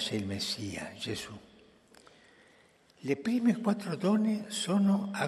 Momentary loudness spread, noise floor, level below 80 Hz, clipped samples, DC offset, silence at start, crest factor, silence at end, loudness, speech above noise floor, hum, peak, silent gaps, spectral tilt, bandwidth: 11 LU; -63 dBFS; -72 dBFS; under 0.1%; under 0.1%; 0 s; 18 dB; 0 s; -31 LUFS; 32 dB; none; -14 dBFS; none; -5 dB/octave; 13 kHz